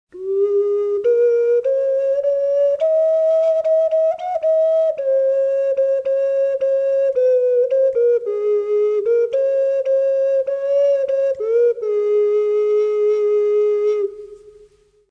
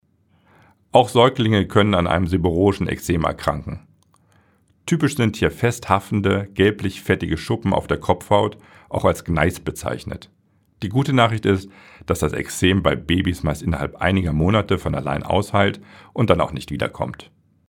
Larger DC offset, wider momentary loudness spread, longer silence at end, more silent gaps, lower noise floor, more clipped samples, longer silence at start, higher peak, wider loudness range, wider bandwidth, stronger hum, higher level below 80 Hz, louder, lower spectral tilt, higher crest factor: neither; second, 3 LU vs 11 LU; first, 0.75 s vs 0.45 s; neither; second, -51 dBFS vs -60 dBFS; neither; second, 0.15 s vs 0.95 s; second, -8 dBFS vs 0 dBFS; second, 1 LU vs 4 LU; second, 6.4 kHz vs 18 kHz; neither; second, -66 dBFS vs -40 dBFS; first, -17 LUFS vs -20 LUFS; about the same, -5 dB/octave vs -6 dB/octave; second, 8 dB vs 20 dB